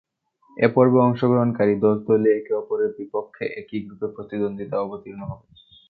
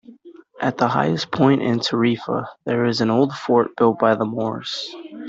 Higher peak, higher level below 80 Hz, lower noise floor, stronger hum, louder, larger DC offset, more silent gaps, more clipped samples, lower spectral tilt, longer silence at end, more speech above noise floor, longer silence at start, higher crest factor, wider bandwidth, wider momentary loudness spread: about the same, -4 dBFS vs -4 dBFS; about the same, -60 dBFS vs -60 dBFS; first, -59 dBFS vs -45 dBFS; neither; about the same, -22 LUFS vs -20 LUFS; neither; neither; neither; first, -11.5 dB/octave vs -6.5 dB/octave; first, 0.55 s vs 0 s; first, 38 dB vs 25 dB; first, 0.55 s vs 0.1 s; about the same, 18 dB vs 16 dB; second, 4.8 kHz vs 7.8 kHz; first, 17 LU vs 9 LU